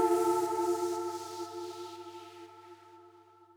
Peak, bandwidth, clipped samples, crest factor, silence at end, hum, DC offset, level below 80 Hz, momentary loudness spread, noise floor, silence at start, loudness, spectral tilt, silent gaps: -16 dBFS; 19.5 kHz; under 0.1%; 18 dB; 0.5 s; 50 Hz at -65 dBFS; under 0.1%; -86 dBFS; 23 LU; -59 dBFS; 0 s; -33 LUFS; -4 dB/octave; none